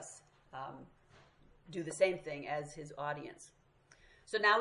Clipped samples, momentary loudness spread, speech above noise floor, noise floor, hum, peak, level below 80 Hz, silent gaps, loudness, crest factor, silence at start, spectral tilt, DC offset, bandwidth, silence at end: under 0.1%; 23 LU; 29 dB; -66 dBFS; none; -16 dBFS; -72 dBFS; none; -38 LUFS; 24 dB; 0 s; -3.5 dB/octave; under 0.1%; 11.5 kHz; 0 s